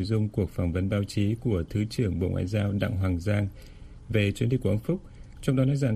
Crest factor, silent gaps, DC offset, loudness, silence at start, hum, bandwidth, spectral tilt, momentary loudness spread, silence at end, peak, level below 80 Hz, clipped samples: 18 dB; none; under 0.1%; -28 LUFS; 0 s; none; 13.5 kHz; -7.5 dB/octave; 4 LU; 0 s; -10 dBFS; -44 dBFS; under 0.1%